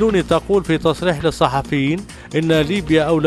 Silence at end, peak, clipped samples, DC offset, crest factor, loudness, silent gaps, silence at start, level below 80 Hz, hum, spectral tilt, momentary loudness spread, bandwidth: 0 s; 0 dBFS; under 0.1%; under 0.1%; 16 dB; -18 LUFS; none; 0 s; -38 dBFS; none; -6 dB/octave; 5 LU; 13.5 kHz